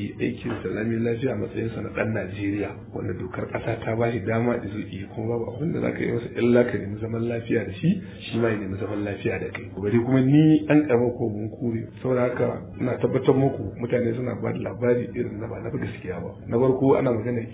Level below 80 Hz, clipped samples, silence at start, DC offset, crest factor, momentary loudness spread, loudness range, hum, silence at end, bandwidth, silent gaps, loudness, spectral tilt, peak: -50 dBFS; under 0.1%; 0 s; under 0.1%; 20 dB; 11 LU; 6 LU; none; 0 s; 4 kHz; none; -25 LUFS; -12 dB/octave; -4 dBFS